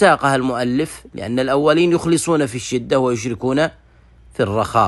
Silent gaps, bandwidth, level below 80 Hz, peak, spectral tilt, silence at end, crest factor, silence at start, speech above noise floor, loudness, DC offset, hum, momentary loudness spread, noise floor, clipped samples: none; 12.5 kHz; -48 dBFS; -2 dBFS; -5 dB/octave; 0 s; 16 dB; 0 s; 30 dB; -18 LUFS; under 0.1%; none; 9 LU; -47 dBFS; under 0.1%